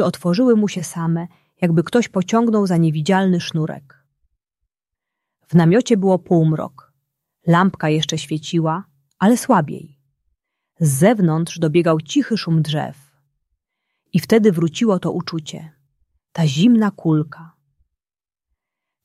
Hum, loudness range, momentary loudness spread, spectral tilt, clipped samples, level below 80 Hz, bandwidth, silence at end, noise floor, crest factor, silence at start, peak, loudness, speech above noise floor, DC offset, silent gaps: none; 3 LU; 12 LU; -6.5 dB/octave; under 0.1%; -60 dBFS; 14 kHz; 1.6 s; under -90 dBFS; 16 dB; 0 s; -2 dBFS; -18 LUFS; over 73 dB; under 0.1%; none